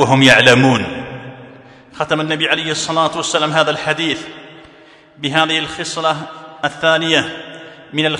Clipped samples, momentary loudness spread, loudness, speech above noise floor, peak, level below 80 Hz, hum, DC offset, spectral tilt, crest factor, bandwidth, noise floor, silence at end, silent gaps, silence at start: 0.2%; 22 LU; -15 LUFS; 29 dB; 0 dBFS; -54 dBFS; none; under 0.1%; -4 dB/octave; 16 dB; 12 kHz; -44 dBFS; 0 s; none; 0 s